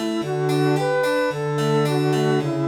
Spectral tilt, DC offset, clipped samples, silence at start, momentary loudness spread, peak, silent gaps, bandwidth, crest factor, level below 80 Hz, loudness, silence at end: -6.5 dB/octave; under 0.1%; under 0.1%; 0 s; 3 LU; -8 dBFS; none; 17 kHz; 12 dB; -60 dBFS; -21 LUFS; 0 s